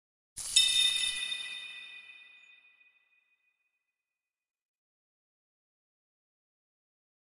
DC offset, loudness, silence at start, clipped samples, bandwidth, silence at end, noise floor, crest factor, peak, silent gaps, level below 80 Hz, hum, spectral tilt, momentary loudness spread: under 0.1%; -27 LUFS; 0.35 s; under 0.1%; 11.5 kHz; 5 s; under -90 dBFS; 26 dB; -10 dBFS; none; -70 dBFS; none; 4 dB/octave; 23 LU